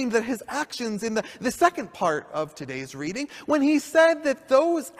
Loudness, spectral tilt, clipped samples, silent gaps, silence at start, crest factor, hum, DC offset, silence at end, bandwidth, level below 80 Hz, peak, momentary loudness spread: -24 LUFS; -4 dB/octave; under 0.1%; none; 0 s; 20 dB; none; under 0.1%; 0.1 s; 15.5 kHz; -62 dBFS; -4 dBFS; 12 LU